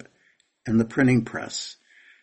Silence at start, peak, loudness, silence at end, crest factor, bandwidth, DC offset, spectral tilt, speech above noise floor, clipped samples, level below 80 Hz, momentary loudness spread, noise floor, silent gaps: 0.65 s; -8 dBFS; -24 LUFS; 0.5 s; 18 dB; 8.8 kHz; under 0.1%; -5.5 dB/octave; 42 dB; under 0.1%; -54 dBFS; 15 LU; -65 dBFS; none